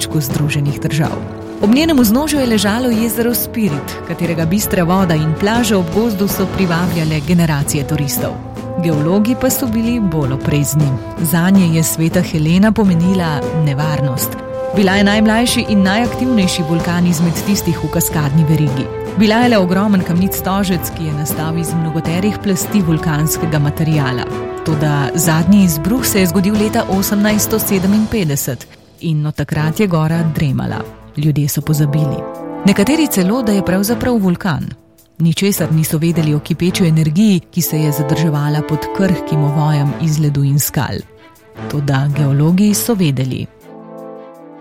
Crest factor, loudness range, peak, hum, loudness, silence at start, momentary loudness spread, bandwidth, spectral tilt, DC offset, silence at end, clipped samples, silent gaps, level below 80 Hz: 14 dB; 3 LU; 0 dBFS; none; -14 LUFS; 0 s; 8 LU; 16.5 kHz; -5.5 dB/octave; under 0.1%; 0 s; under 0.1%; none; -36 dBFS